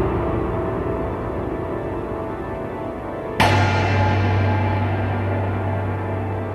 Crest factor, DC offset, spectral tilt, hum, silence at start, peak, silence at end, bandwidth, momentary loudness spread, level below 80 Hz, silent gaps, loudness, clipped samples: 16 dB; under 0.1%; -7 dB/octave; none; 0 s; -4 dBFS; 0 s; 12 kHz; 10 LU; -36 dBFS; none; -22 LUFS; under 0.1%